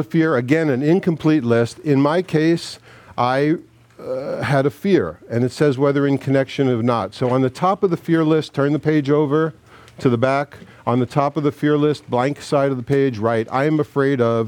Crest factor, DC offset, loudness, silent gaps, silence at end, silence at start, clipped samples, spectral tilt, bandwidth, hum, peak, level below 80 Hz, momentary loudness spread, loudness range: 18 dB; under 0.1%; -19 LUFS; none; 0 s; 0 s; under 0.1%; -7.5 dB/octave; 14.5 kHz; none; -2 dBFS; -60 dBFS; 6 LU; 2 LU